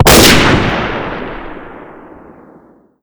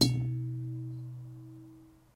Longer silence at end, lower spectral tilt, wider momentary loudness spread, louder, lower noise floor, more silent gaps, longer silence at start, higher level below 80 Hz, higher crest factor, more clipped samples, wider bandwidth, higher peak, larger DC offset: first, 1.1 s vs 0.25 s; second, -3.5 dB/octave vs -5 dB/octave; first, 25 LU vs 20 LU; first, -9 LUFS vs -36 LUFS; second, -44 dBFS vs -55 dBFS; neither; about the same, 0 s vs 0 s; first, -26 dBFS vs -56 dBFS; second, 12 dB vs 24 dB; first, 1% vs under 0.1%; first, over 20 kHz vs 16 kHz; first, 0 dBFS vs -10 dBFS; neither